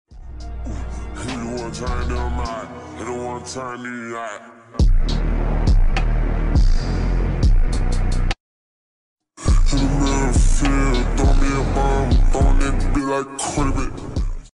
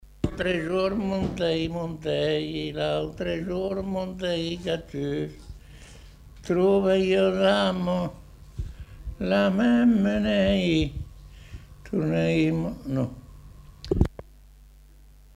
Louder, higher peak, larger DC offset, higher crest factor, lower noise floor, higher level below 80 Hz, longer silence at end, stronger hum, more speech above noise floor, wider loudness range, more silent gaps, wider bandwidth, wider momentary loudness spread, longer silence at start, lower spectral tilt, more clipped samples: first, -22 LUFS vs -25 LUFS; second, -8 dBFS vs -4 dBFS; neither; second, 8 dB vs 22 dB; first, under -90 dBFS vs -51 dBFS; first, -20 dBFS vs -42 dBFS; second, 0.1 s vs 0.7 s; neither; first, over 69 dB vs 27 dB; first, 8 LU vs 5 LU; first, 8.40-9.16 s vs none; second, 11 kHz vs 12.5 kHz; second, 12 LU vs 20 LU; second, 0.1 s vs 0.25 s; second, -5.5 dB/octave vs -7 dB/octave; neither